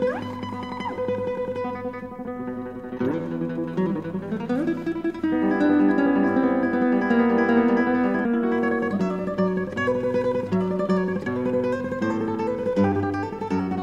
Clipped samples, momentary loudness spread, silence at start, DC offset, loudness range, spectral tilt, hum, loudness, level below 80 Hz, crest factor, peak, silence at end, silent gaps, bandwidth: under 0.1%; 11 LU; 0 s; under 0.1%; 8 LU; -8.5 dB/octave; none; -24 LUFS; -54 dBFS; 16 dB; -8 dBFS; 0 s; none; 7.8 kHz